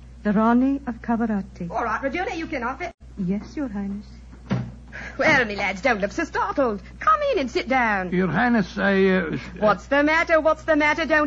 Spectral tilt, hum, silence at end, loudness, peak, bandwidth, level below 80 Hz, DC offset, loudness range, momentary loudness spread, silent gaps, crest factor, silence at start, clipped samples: -6 dB/octave; none; 0 s; -22 LUFS; -6 dBFS; 8 kHz; -44 dBFS; under 0.1%; 8 LU; 11 LU; 2.94-2.98 s; 16 dB; 0 s; under 0.1%